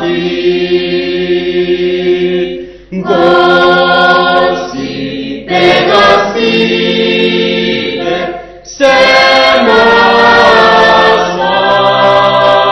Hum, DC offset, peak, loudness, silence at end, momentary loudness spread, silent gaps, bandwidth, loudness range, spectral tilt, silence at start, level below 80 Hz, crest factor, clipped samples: none; under 0.1%; 0 dBFS; -8 LUFS; 0 s; 12 LU; none; 11 kHz; 4 LU; -4.5 dB/octave; 0 s; -40 dBFS; 8 dB; 2%